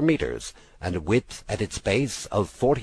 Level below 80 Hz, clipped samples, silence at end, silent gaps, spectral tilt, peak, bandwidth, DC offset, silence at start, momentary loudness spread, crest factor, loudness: -44 dBFS; under 0.1%; 0 s; none; -5.5 dB/octave; -8 dBFS; 11 kHz; under 0.1%; 0 s; 10 LU; 16 dB; -27 LUFS